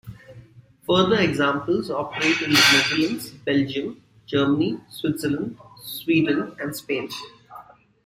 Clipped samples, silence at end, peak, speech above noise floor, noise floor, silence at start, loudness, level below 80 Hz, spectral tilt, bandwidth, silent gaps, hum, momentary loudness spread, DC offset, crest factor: under 0.1%; 0.45 s; -4 dBFS; 27 dB; -49 dBFS; 0.05 s; -21 LUFS; -58 dBFS; -4 dB/octave; 16 kHz; none; none; 18 LU; under 0.1%; 20 dB